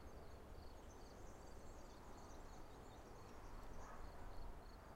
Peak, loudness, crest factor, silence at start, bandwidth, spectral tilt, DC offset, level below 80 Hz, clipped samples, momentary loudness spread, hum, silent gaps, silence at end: -40 dBFS; -60 LUFS; 16 dB; 0 s; 16 kHz; -5 dB/octave; under 0.1%; -58 dBFS; under 0.1%; 2 LU; none; none; 0 s